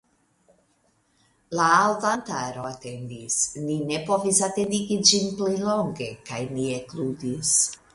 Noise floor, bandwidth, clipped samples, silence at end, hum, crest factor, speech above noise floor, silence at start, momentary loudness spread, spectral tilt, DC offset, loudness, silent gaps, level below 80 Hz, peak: -66 dBFS; 11.5 kHz; under 0.1%; 0.2 s; none; 24 dB; 42 dB; 1.5 s; 14 LU; -2.5 dB/octave; under 0.1%; -23 LUFS; none; -60 dBFS; -2 dBFS